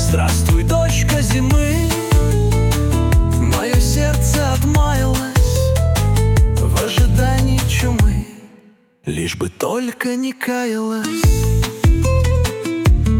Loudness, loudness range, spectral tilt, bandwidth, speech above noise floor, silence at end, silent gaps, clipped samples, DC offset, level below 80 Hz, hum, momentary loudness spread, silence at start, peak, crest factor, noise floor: -16 LUFS; 4 LU; -5.5 dB/octave; 17.5 kHz; 33 dB; 0 s; none; under 0.1%; under 0.1%; -20 dBFS; none; 6 LU; 0 s; -4 dBFS; 10 dB; -49 dBFS